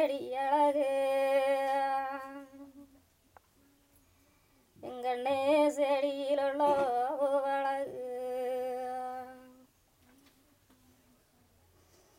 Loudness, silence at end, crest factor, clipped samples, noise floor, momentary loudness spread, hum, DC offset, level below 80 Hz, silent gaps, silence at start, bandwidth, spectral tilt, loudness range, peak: -31 LUFS; 2.65 s; 16 dB; under 0.1%; -67 dBFS; 16 LU; none; under 0.1%; -76 dBFS; none; 0 s; 16 kHz; -4 dB/octave; 13 LU; -18 dBFS